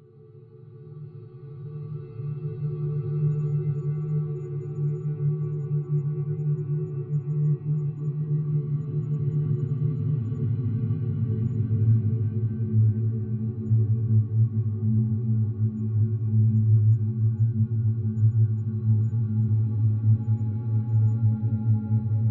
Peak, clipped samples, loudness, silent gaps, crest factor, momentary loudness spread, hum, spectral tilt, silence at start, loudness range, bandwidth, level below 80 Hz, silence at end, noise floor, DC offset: -12 dBFS; under 0.1%; -26 LUFS; none; 12 dB; 8 LU; none; -13.5 dB/octave; 0.25 s; 5 LU; 1.6 kHz; -60 dBFS; 0 s; -49 dBFS; under 0.1%